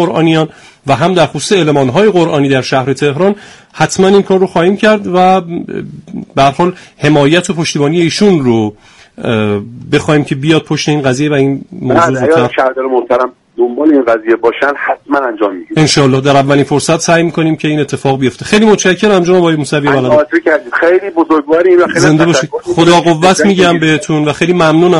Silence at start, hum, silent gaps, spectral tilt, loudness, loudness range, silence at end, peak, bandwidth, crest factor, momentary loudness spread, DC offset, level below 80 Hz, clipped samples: 0 s; none; none; -5.5 dB/octave; -10 LUFS; 3 LU; 0 s; 0 dBFS; 11.5 kHz; 10 dB; 7 LU; under 0.1%; -44 dBFS; 0.2%